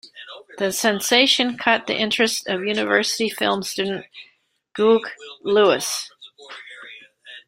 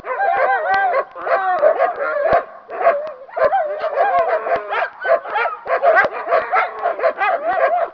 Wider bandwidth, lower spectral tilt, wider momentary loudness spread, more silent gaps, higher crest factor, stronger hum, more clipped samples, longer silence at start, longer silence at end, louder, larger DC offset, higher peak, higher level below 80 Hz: first, 16 kHz vs 5.4 kHz; second, -2.5 dB/octave vs -5 dB/octave; first, 22 LU vs 6 LU; neither; about the same, 20 dB vs 16 dB; neither; neither; about the same, 0.05 s vs 0 s; about the same, 0.1 s vs 0 s; about the same, -19 LUFS vs -18 LUFS; neither; about the same, -2 dBFS vs -2 dBFS; second, -66 dBFS vs -56 dBFS